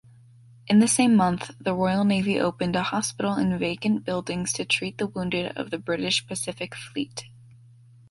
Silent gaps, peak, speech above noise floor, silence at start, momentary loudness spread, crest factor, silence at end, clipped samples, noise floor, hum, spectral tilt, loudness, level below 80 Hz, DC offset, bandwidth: none; -6 dBFS; 27 dB; 0.65 s; 12 LU; 18 dB; 0.85 s; under 0.1%; -52 dBFS; none; -4.5 dB/octave; -25 LUFS; -56 dBFS; under 0.1%; 11.5 kHz